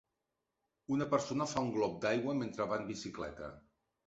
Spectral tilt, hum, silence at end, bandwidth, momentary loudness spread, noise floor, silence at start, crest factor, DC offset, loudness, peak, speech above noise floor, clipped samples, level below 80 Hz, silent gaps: -5 dB/octave; none; 0.45 s; 8 kHz; 11 LU; -87 dBFS; 0.9 s; 18 dB; under 0.1%; -36 LUFS; -18 dBFS; 51 dB; under 0.1%; -66 dBFS; none